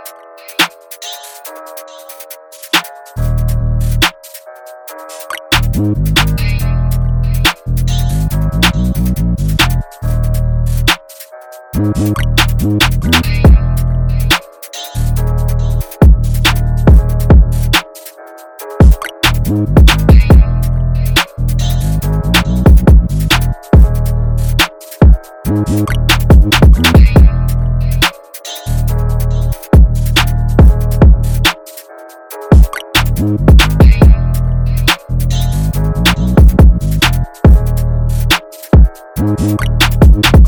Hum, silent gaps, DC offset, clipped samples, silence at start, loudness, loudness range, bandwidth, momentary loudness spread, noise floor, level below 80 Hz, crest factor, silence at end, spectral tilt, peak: none; none; under 0.1%; 1%; 0 s; -11 LUFS; 5 LU; over 20 kHz; 17 LU; -34 dBFS; -12 dBFS; 10 dB; 0 s; -5.5 dB/octave; 0 dBFS